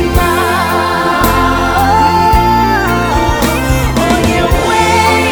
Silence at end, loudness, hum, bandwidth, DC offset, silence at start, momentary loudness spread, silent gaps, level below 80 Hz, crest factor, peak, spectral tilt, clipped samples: 0 s; -10 LUFS; none; over 20 kHz; under 0.1%; 0 s; 3 LU; none; -20 dBFS; 10 dB; 0 dBFS; -5 dB/octave; 0.2%